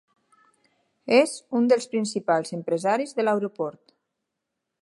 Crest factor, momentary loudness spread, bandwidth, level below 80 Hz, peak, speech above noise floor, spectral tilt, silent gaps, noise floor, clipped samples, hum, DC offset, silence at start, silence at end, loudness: 20 dB; 10 LU; 11.5 kHz; -80 dBFS; -6 dBFS; 59 dB; -4.5 dB/octave; none; -82 dBFS; under 0.1%; none; under 0.1%; 1.05 s; 1.1 s; -24 LUFS